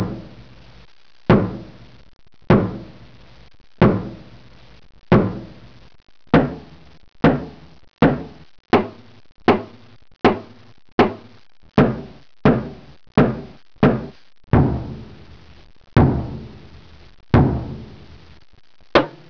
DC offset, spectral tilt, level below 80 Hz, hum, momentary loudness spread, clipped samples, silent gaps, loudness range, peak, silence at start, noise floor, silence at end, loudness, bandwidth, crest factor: 0.5%; -9 dB/octave; -36 dBFS; none; 20 LU; under 0.1%; 10.92-10.98 s; 2 LU; -6 dBFS; 0 s; -46 dBFS; 0.2 s; -19 LUFS; 5.4 kHz; 16 dB